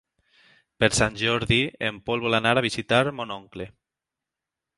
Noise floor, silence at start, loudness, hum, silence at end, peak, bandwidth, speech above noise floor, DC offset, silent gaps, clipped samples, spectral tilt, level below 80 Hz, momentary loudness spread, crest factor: -88 dBFS; 0.8 s; -23 LUFS; none; 1.1 s; -2 dBFS; 11.5 kHz; 64 dB; under 0.1%; none; under 0.1%; -4 dB/octave; -48 dBFS; 14 LU; 24 dB